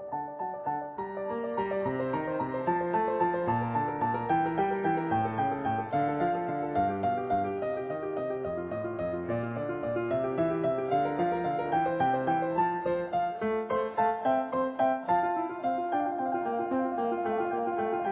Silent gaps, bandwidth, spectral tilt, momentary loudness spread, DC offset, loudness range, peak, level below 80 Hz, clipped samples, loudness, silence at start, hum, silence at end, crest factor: none; 4 kHz; -6 dB/octave; 6 LU; under 0.1%; 3 LU; -16 dBFS; -60 dBFS; under 0.1%; -30 LUFS; 0 s; none; 0 s; 14 dB